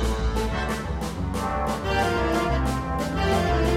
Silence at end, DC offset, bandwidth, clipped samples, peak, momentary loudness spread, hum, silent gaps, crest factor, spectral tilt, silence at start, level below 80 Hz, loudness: 0 s; under 0.1%; 15.5 kHz; under 0.1%; -10 dBFS; 6 LU; none; none; 14 dB; -5.5 dB/octave; 0 s; -30 dBFS; -25 LUFS